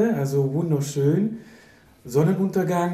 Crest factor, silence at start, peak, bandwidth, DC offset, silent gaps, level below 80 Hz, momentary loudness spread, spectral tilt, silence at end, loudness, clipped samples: 16 dB; 0 s; -8 dBFS; 15 kHz; under 0.1%; none; -60 dBFS; 5 LU; -7.5 dB/octave; 0 s; -23 LUFS; under 0.1%